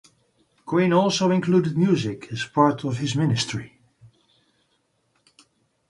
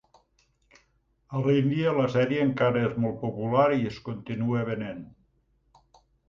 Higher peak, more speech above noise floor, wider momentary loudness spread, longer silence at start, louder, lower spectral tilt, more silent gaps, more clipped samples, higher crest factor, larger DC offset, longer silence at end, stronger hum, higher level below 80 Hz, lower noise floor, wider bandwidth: first, -4 dBFS vs -10 dBFS; first, 48 dB vs 43 dB; about the same, 9 LU vs 11 LU; second, 0.65 s vs 1.3 s; first, -22 LUFS vs -26 LUFS; second, -6 dB/octave vs -8.5 dB/octave; neither; neither; about the same, 20 dB vs 18 dB; neither; first, 2.2 s vs 1.25 s; neither; about the same, -60 dBFS vs -60 dBFS; about the same, -69 dBFS vs -69 dBFS; first, 11.5 kHz vs 7.2 kHz